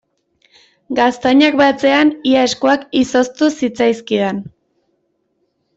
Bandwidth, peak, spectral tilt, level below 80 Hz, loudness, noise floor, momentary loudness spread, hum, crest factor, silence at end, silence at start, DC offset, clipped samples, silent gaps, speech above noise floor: 8 kHz; -2 dBFS; -4 dB/octave; -54 dBFS; -14 LUFS; -66 dBFS; 6 LU; none; 14 dB; 1.3 s; 0.9 s; under 0.1%; under 0.1%; none; 52 dB